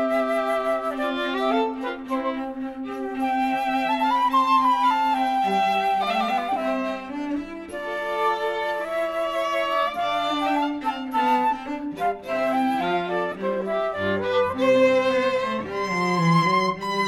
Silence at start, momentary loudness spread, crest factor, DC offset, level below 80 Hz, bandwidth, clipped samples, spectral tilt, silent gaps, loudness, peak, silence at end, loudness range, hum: 0 s; 10 LU; 14 dB; under 0.1%; -58 dBFS; 16 kHz; under 0.1%; -5.5 dB/octave; none; -23 LUFS; -8 dBFS; 0 s; 4 LU; none